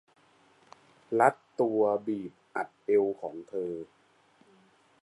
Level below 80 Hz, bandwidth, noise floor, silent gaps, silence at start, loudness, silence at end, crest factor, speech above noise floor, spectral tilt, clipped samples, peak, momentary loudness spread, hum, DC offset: -78 dBFS; 11.5 kHz; -64 dBFS; none; 1.1 s; -30 LUFS; 1.2 s; 22 dB; 35 dB; -7 dB/octave; under 0.1%; -8 dBFS; 13 LU; none; under 0.1%